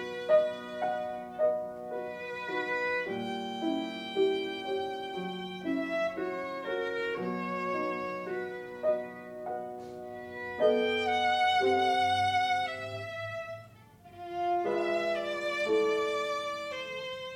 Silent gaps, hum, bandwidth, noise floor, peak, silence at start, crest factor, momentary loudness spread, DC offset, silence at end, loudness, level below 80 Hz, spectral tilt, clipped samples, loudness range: none; none; 16 kHz; -54 dBFS; -14 dBFS; 0 s; 18 dB; 12 LU; under 0.1%; 0 s; -32 LUFS; -72 dBFS; -4.5 dB/octave; under 0.1%; 6 LU